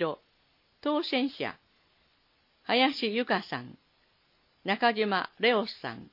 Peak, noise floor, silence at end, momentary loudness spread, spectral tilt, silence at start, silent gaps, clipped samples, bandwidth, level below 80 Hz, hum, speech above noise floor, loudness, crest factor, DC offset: -10 dBFS; -69 dBFS; 0.1 s; 14 LU; -6 dB/octave; 0 s; none; under 0.1%; 5.8 kHz; -78 dBFS; none; 40 dB; -29 LUFS; 22 dB; under 0.1%